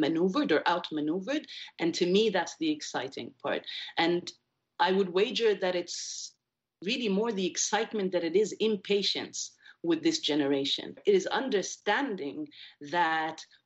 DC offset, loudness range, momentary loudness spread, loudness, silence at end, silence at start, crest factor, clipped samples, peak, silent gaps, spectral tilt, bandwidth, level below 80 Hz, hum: under 0.1%; 2 LU; 11 LU; -30 LUFS; 0.2 s; 0 s; 16 dB; under 0.1%; -12 dBFS; none; -3.5 dB/octave; 8.4 kHz; -78 dBFS; none